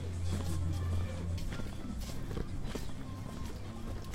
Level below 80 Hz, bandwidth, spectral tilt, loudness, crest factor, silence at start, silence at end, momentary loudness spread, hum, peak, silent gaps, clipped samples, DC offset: -42 dBFS; 16 kHz; -6 dB/octave; -40 LUFS; 14 dB; 0 s; 0 s; 8 LU; none; -22 dBFS; none; under 0.1%; under 0.1%